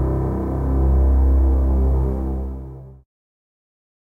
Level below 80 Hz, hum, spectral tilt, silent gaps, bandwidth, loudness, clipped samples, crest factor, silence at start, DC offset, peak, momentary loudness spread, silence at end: -20 dBFS; none; -11.5 dB/octave; none; 1.9 kHz; -20 LUFS; under 0.1%; 12 dB; 0 s; 0.4%; -8 dBFS; 15 LU; 1.15 s